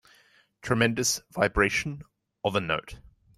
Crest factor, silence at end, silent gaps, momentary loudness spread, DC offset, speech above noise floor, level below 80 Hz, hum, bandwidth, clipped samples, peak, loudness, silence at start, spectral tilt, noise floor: 22 dB; 0.4 s; none; 16 LU; under 0.1%; 35 dB; -46 dBFS; none; 15.5 kHz; under 0.1%; -8 dBFS; -27 LUFS; 0.65 s; -3.5 dB/octave; -62 dBFS